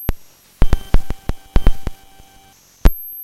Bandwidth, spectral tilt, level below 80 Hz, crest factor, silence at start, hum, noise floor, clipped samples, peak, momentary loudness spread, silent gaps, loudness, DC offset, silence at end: 13 kHz; -6.5 dB/octave; -18 dBFS; 16 dB; 0 s; none; -48 dBFS; 0.5%; 0 dBFS; 12 LU; none; -23 LUFS; under 0.1%; 0 s